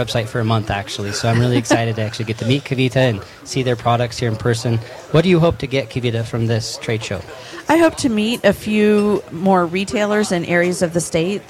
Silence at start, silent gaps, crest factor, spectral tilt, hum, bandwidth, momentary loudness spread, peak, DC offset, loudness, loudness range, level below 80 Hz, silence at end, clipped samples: 0 s; none; 14 dB; -5.5 dB/octave; none; 15 kHz; 8 LU; -2 dBFS; under 0.1%; -18 LUFS; 2 LU; -44 dBFS; 0.1 s; under 0.1%